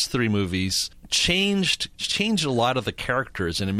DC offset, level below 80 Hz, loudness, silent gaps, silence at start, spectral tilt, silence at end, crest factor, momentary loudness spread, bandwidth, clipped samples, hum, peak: under 0.1%; -46 dBFS; -23 LUFS; none; 0 s; -3.5 dB/octave; 0 s; 16 dB; 6 LU; 15.5 kHz; under 0.1%; none; -8 dBFS